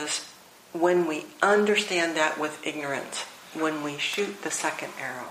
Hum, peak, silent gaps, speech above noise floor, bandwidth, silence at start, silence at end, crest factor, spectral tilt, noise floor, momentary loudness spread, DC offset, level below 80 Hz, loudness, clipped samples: none; -6 dBFS; none; 23 dB; 15.5 kHz; 0 s; 0 s; 22 dB; -3 dB/octave; -49 dBFS; 12 LU; under 0.1%; -76 dBFS; -27 LUFS; under 0.1%